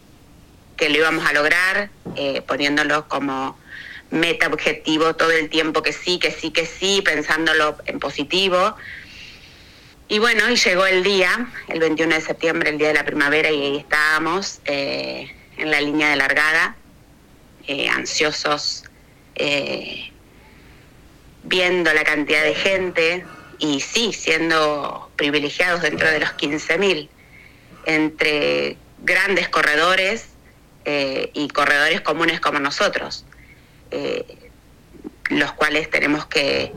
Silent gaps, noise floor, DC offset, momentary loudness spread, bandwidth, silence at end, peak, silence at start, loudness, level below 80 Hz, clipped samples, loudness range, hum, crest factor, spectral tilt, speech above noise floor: none; -49 dBFS; under 0.1%; 12 LU; 16.5 kHz; 0 s; 0 dBFS; 0.8 s; -19 LUFS; -50 dBFS; under 0.1%; 4 LU; none; 20 dB; -3 dB/octave; 29 dB